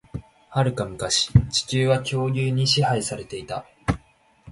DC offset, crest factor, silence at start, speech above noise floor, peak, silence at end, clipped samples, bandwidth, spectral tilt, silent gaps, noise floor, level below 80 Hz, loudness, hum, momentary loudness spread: under 0.1%; 22 dB; 0.15 s; 35 dB; -2 dBFS; 0 s; under 0.1%; 11.5 kHz; -4.5 dB/octave; none; -57 dBFS; -40 dBFS; -23 LUFS; none; 13 LU